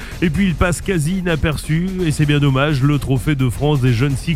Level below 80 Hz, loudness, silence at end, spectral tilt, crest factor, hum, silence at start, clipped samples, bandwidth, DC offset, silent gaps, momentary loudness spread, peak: -28 dBFS; -17 LUFS; 0 s; -6.5 dB/octave; 16 dB; none; 0 s; under 0.1%; 15.5 kHz; under 0.1%; none; 4 LU; 0 dBFS